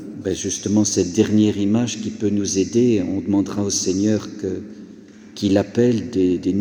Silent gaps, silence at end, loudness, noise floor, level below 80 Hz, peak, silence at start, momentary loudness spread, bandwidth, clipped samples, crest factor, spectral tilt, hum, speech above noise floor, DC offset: none; 0 s; -20 LUFS; -42 dBFS; -54 dBFS; -4 dBFS; 0 s; 10 LU; 14.5 kHz; under 0.1%; 16 dB; -5 dB/octave; none; 23 dB; under 0.1%